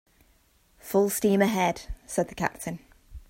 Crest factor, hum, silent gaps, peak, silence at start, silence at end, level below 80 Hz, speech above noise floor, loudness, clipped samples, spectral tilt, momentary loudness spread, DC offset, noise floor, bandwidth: 20 dB; none; none; -8 dBFS; 0.85 s; 0.1 s; -48 dBFS; 37 dB; -27 LUFS; under 0.1%; -5 dB/octave; 15 LU; under 0.1%; -63 dBFS; 16.5 kHz